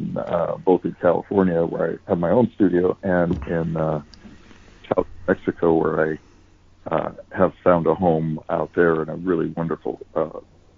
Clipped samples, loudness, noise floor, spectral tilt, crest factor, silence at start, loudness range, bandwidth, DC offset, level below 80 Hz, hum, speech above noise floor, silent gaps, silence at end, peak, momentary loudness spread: under 0.1%; -22 LUFS; -51 dBFS; -10 dB/octave; 18 dB; 0 s; 4 LU; 6.8 kHz; under 0.1%; -48 dBFS; none; 31 dB; none; 0.4 s; -4 dBFS; 8 LU